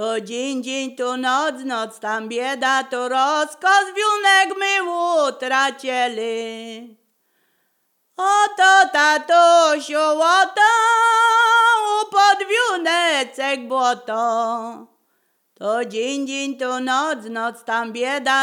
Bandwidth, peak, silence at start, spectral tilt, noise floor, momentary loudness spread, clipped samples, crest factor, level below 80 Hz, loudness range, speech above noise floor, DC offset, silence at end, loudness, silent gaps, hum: 16 kHz; -2 dBFS; 0 s; -1 dB/octave; -68 dBFS; 12 LU; under 0.1%; 16 dB; -86 dBFS; 9 LU; 50 dB; under 0.1%; 0 s; -18 LUFS; none; none